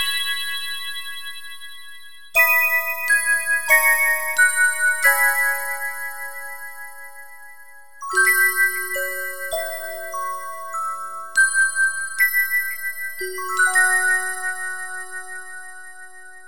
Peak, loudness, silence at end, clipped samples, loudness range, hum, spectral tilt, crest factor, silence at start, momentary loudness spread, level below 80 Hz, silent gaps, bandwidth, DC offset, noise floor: -2 dBFS; -19 LUFS; 0 s; under 0.1%; 6 LU; none; 1.5 dB/octave; 20 dB; 0 s; 20 LU; -66 dBFS; none; 18.5 kHz; 2%; -46 dBFS